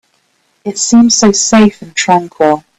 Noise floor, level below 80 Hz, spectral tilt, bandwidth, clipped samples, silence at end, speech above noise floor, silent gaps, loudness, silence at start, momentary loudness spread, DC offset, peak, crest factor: -57 dBFS; -46 dBFS; -3.5 dB/octave; 8.6 kHz; under 0.1%; 0.2 s; 48 dB; none; -9 LUFS; 0.65 s; 9 LU; under 0.1%; 0 dBFS; 10 dB